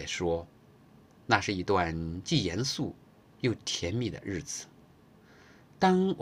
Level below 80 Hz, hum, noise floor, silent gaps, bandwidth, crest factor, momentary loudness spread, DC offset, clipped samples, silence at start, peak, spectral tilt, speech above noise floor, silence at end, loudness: -58 dBFS; none; -58 dBFS; none; 15 kHz; 24 dB; 12 LU; under 0.1%; under 0.1%; 0 s; -8 dBFS; -4.5 dB/octave; 28 dB; 0 s; -31 LUFS